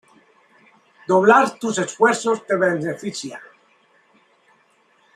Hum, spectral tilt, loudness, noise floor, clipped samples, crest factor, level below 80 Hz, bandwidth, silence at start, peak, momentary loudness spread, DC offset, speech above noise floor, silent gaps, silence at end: none; -4.5 dB/octave; -19 LUFS; -59 dBFS; under 0.1%; 20 dB; -70 dBFS; 12.5 kHz; 1.1 s; -2 dBFS; 18 LU; under 0.1%; 41 dB; none; 1.75 s